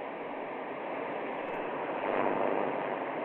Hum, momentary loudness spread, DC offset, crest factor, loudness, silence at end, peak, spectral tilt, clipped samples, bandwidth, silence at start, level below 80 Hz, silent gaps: none; 8 LU; under 0.1%; 18 dB; -34 LUFS; 0 s; -16 dBFS; -8 dB/octave; under 0.1%; 4.5 kHz; 0 s; -74 dBFS; none